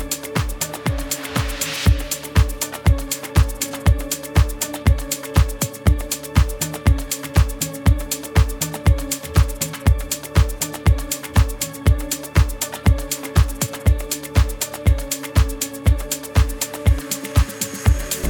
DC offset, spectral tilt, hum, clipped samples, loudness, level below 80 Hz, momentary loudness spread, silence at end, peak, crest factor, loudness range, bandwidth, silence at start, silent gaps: under 0.1%; -4.5 dB/octave; none; under 0.1%; -21 LUFS; -22 dBFS; 3 LU; 0 s; -2 dBFS; 18 dB; 1 LU; over 20 kHz; 0 s; none